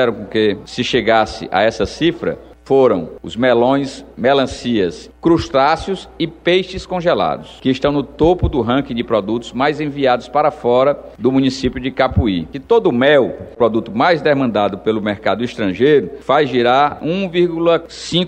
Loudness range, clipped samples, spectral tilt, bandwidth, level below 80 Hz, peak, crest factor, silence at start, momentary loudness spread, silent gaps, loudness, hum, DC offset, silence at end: 2 LU; under 0.1%; -6 dB/octave; 9.6 kHz; -36 dBFS; -2 dBFS; 14 dB; 0 s; 7 LU; none; -16 LUFS; none; under 0.1%; 0 s